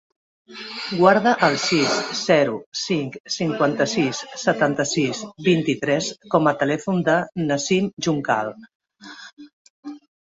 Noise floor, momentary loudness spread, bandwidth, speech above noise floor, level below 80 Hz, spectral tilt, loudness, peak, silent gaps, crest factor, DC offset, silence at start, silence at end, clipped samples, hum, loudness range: -42 dBFS; 19 LU; 8 kHz; 21 dB; -62 dBFS; -4.5 dB/octave; -21 LUFS; -2 dBFS; 2.66-2.72 s, 3.20-3.24 s, 8.75-8.80 s, 9.33-9.37 s, 9.53-9.83 s; 20 dB; under 0.1%; 0.5 s; 0.3 s; under 0.1%; none; 3 LU